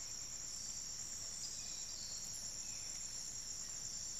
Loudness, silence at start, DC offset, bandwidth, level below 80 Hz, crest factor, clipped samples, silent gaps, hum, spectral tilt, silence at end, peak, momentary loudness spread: -44 LUFS; 0 s; 0.1%; 15.5 kHz; -64 dBFS; 16 dB; under 0.1%; none; none; 0.5 dB/octave; 0 s; -30 dBFS; 1 LU